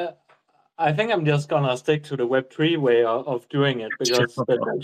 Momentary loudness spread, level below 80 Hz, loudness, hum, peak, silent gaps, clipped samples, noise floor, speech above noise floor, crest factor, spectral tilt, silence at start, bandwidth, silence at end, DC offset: 5 LU; -68 dBFS; -22 LUFS; none; -6 dBFS; none; under 0.1%; -61 dBFS; 39 dB; 16 dB; -5.5 dB/octave; 0 s; 14.5 kHz; 0 s; under 0.1%